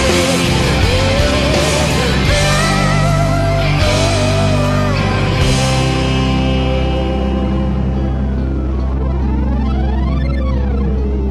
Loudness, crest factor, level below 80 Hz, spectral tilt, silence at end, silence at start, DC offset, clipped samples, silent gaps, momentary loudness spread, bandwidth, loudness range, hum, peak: -15 LUFS; 12 dB; -18 dBFS; -5 dB/octave; 0 s; 0 s; under 0.1%; under 0.1%; none; 5 LU; 13 kHz; 4 LU; none; -2 dBFS